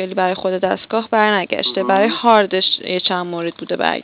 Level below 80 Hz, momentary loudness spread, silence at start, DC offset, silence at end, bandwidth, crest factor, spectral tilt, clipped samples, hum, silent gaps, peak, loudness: -62 dBFS; 8 LU; 0 s; under 0.1%; 0 s; 4 kHz; 18 dB; -8.5 dB/octave; 0.1%; none; none; 0 dBFS; -17 LUFS